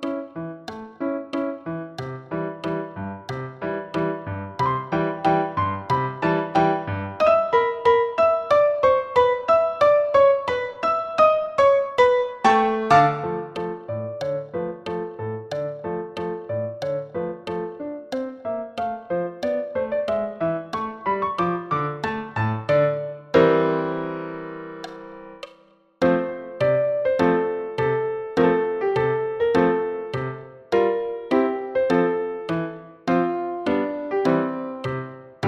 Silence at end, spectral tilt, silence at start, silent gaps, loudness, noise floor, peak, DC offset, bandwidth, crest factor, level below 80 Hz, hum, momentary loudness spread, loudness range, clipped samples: 0 s; -7 dB/octave; 0 s; none; -23 LUFS; -55 dBFS; -4 dBFS; under 0.1%; 10 kHz; 20 dB; -56 dBFS; none; 14 LU; 10 LU; under 0.1%